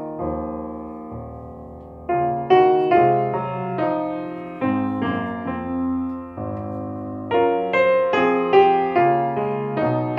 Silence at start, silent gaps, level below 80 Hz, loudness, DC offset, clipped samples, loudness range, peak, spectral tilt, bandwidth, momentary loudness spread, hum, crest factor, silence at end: 0 s; none; -50 dBFS; -21 LUFS; under 0.1%; under 0.1%; 6 LU; -4 dBFS; -8.5 dB/octave; 6 kHz; 18 LU; none; 18 dB; 0 s